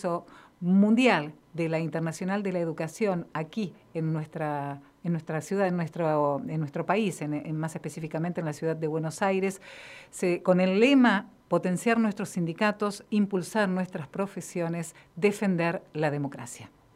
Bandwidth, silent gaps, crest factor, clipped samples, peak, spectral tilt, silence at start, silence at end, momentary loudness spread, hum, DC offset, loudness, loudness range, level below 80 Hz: 14.5 kHz; none; 20 dB; under 0.1%; -8 dBFS; -6.5 dB/octave; 0 s; 0.3 s; 12 LU; none; under 0.1%; -28 LUFS; 6 LU; -70 dBFS